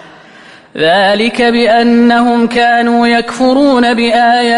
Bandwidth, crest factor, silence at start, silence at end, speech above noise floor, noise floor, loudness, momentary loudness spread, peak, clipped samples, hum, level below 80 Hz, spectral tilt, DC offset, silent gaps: 11 kHz; 10 dB; 0.75 s; 0 s; 28 dB; -37 dBFS; -9 LUFS; 3 LU; 0 dBFS; under 0.1%; none; -46 dBFS; -4.5 dB/octave; under 0.1%; none